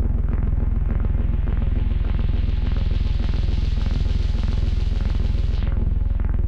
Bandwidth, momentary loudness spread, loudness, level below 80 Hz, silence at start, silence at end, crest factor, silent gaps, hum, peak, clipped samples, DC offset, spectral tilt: 6 kHz; 1 LU; -24 LUFS; -20 dBFS; 0 s; 0 s; 8 dB; none; none; -12 dBFS; under 0.1%; under 0.1%; -8.5 dB/octave